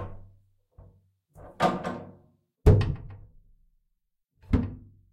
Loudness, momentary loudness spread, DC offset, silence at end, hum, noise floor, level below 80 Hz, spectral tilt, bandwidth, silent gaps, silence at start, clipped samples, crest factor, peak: -27 LUFS; 25 LU; under 0.1%; 0.3 s; none; -77 dBFS; -38 dBFS; -8 dB/octave; 11 kHz; none; 0 s; under 0.1%; 22 dB; -8 dBFS